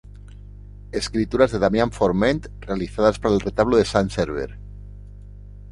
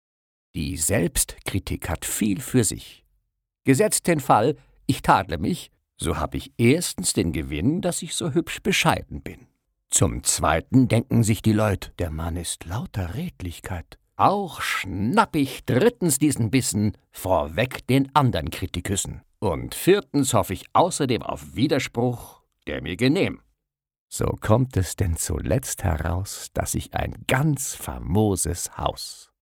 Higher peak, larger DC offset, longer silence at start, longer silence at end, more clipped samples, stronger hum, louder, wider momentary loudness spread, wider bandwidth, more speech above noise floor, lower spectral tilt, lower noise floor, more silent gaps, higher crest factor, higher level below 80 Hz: about the same, -2 dBFS vs -4 dBFS; neither; second, 0.15 s vs 0.55 s; second, 0 s vs 0.25 s; neither; first, 50 Hz at -35 dBFS vs none; about the same, -21 LUFS vs -23 LUFS; first, 20 LU vs 11 LU; second, 11.5 kHz vs 18.5 kHz; second, 19 dB vs 56 dB; first, -6 dB/octave vs -4.5 dB/octave; second, -40 dBFS vs -79 dBFS; second, none vs 23.98-24.08 s; about the same, 20 dB vs 20 dB; about the same, -38 dBFS vs -40 dBFS